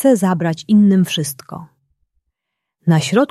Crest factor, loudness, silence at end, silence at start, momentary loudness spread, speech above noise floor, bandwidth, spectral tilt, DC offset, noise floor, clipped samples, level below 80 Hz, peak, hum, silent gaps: 14 dB; -15 LUFS; 0.05 s; 0 s; 19 LU; 65 dB; 13.5 kHz; -6 dB/octave; under 0.1%; -79 dBFS; under 0.1%; -62 dBFS; -2 dBFS; none; none